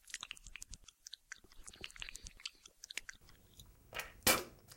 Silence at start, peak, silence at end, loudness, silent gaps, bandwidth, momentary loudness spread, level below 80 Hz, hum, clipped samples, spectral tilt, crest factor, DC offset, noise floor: 0.05 s; -16 dBFS; 0 s; -40 LUFS; none; 16.5 kHz; 24 LU; -62 dBFS; none; under 0.1%; -1 dB/octave; 28 dB; under 0.1%; -62 dBFS